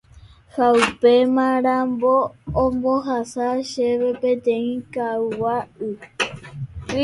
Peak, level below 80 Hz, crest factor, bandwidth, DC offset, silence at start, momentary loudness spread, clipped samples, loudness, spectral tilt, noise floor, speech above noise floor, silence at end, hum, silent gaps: -2 dBFS; -46 dBFS; 18 dB; 11.5 kHz; under 0.1%; 0.15 s; 13 LU; under 0.1%; -20 LUFS; -5.5 dB/octave; -47 dBFS; 28 dB; 0 s; none; none